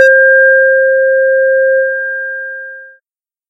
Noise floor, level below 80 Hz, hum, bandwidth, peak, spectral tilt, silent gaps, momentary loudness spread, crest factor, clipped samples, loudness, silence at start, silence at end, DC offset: -78 dBFS; under -90 dBFS; none; 6.2 kHz; 0 dBFS; 1 dB/octave; none; 16 LU; 10 dB; 0.2%; -9 LUFS; 0 s; 0.6 s; under 0.1%